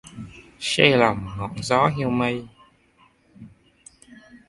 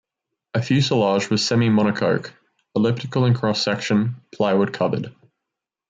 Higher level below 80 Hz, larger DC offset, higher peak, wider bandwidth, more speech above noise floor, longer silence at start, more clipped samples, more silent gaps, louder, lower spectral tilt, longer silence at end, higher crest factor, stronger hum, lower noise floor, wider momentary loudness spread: first, -52 dBFS vs -62 dBFS; neither; first, 0 dBFS vs -6 dBFS; first, 11.5 kHz vs 9 kHz; second, 38 dB vs 64 dB; second, 0.05 s vs 0.55 s; neither; neither; about the same, -21 LUFS vs -21 LUFS; about the same, -5 dB/octave vs -6 dB/octave; second, 0.1 s vs 0.8 s; first, 24 dB vs 14 dB; neither; second, -59 dBFS vs -84 dBFS; first, 22 LU vs 10 LU